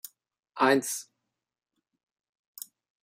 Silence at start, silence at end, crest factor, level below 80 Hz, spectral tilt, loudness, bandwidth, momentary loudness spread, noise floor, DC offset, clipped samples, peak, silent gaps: 0.55 s; 2.1 s; 24 dB; -86 dBFS; -3 dB/octave; -27 LUFS; 16 kHz; 22 LU; -87 dBFS; under 0.1%; under 0.1%; -8 dBFS; none